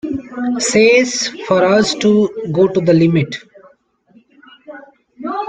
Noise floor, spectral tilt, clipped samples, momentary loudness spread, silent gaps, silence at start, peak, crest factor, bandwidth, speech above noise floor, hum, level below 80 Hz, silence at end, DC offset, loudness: -52 dBFS; -5 dB/octave; under 0.1%; 13 LU; none; 0.05 s; 0 dBFS; 14 dB; 9.6 kHz; 38 dB; none; -54 dBFS; 0 s; under 0.1%; -14 LUFS